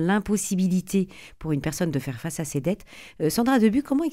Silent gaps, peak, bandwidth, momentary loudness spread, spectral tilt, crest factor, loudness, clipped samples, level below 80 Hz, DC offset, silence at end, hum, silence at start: none; -8 dBFS; 16 kHz; 12 LU; -5.5 dB/octave; 16 dB; -25 LUFS; under 0.1%; -50 dBFS; 0.2%; 0 s; none; 0 s